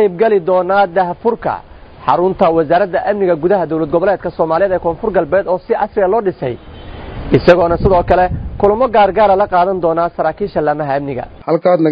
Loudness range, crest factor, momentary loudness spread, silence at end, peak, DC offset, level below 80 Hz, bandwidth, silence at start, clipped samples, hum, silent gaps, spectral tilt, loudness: 3 LU; 14 dB; 10 LU; 0 s; 0 dBFS; under 0.1%; -34 dBFS; 6.2 kHz; 0 s; 0.2%; none; none; -9 dB/octave; -14 LUFS